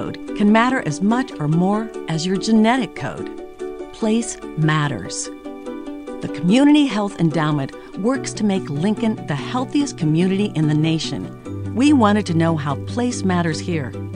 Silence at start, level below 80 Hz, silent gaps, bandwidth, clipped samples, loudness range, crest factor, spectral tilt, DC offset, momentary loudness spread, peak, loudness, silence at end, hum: 0 s; -50 dBFS; none; 10.5 kHz; under 0.1%; 3 LU; 16 dB; -6 dB/octave; under 0.1%; 15 LU; -2 dBFS; -19 LUFS; 0 s; none